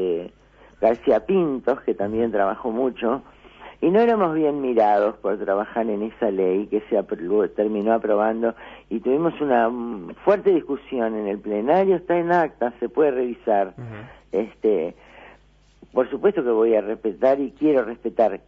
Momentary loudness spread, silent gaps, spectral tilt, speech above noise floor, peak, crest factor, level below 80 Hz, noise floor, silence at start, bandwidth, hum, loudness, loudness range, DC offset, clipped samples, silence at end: 8 LU; none; -8.5 dB/octave; 33 dB; -4 dBFS; 16 dB; -56 dBFS; -54 dBFS; 0 s; 6 kHz; none; -22 LUFS; 3 LU; under 0.1%; under 0.1%; 0.1 s